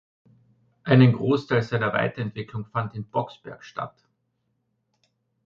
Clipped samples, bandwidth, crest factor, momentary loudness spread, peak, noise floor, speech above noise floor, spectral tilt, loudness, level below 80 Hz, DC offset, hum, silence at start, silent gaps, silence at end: under 0.1%; 6.8 kHz; 20 dB; 19 LU; -6 dBFS; -74 dBFS; 51 dB; -8.5 dB/octave; -24 LUFS; -62 dBFS; under 0.1%; none; 0.85 s; none; 1.55 s